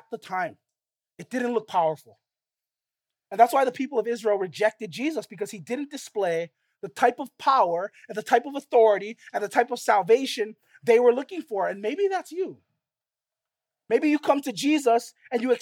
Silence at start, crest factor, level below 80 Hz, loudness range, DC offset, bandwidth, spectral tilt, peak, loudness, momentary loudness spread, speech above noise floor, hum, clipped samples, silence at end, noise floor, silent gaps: 0.1 s; 22 dB; -84 dBFS; 5 LU; under 0.1%; 16.5 kHz; -4 dB/octave; -4 dBFS; -25 LUFS; 13 LU; over 66 dB; none; under 0.1%; 0.05 s; under -90 dBFS; none